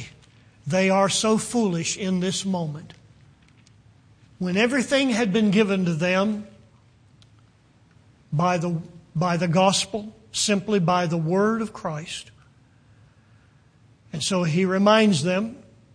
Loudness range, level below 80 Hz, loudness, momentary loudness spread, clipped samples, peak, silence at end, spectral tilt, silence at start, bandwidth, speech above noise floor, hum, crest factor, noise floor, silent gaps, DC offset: 5 LU; -60 dBFS; -22 LUFS; 13 LU; under 0.1%; -4 dBFS; 0.35 s; -4.5 dB/octave; 0 s; 10.5 kHz; 35 dB; none; 20 dB; -57 dBFS; none; under 0.1%